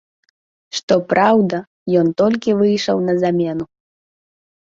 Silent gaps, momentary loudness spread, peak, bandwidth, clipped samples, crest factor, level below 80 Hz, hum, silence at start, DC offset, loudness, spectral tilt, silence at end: 0.83-0.88 s, 1.67-1.86 s; 12 LU; -2 dBFS; 7.8 kHz; under 0.1%; 16 dB; -58 dBFS; none; 0.75 s; under 0.1%; -17 LUFS; -6 dB/octave; 1 s